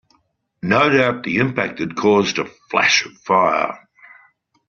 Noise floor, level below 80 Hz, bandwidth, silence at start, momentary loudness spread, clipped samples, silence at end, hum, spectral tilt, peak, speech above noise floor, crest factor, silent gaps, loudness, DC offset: -64 dBFS; -58 dBFS; 7.4 kHz; 0.65 s; 10 LU; under 0.1%; 0.9 s; none; -3 dB/octave; -2 dBFS; 47 dB; 18 dB; none; -17 LUFS; under 0.1%